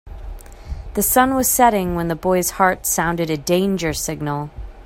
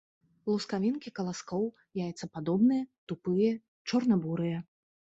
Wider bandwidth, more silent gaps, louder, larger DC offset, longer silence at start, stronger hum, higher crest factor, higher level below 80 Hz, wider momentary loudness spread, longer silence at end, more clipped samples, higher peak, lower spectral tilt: first, 16.5 kHz vs 8 kHz; second, none vs 2.98-3.07 s, 3.68-3.85 s; first, -18 LUFS vs -32 LUFS; neither; second, 0.05 s vs 0.45 s; neither; first, 20 dB vs 14 dB; first, -36 dBFS vs -72 dBFS; first, 19 LU vs 11 LU; second, 0.05 s vs 0.5 s; neither; first, 0 dBFS vs -16 dBFS; second, -4 dB/octave vs -7 dB/octave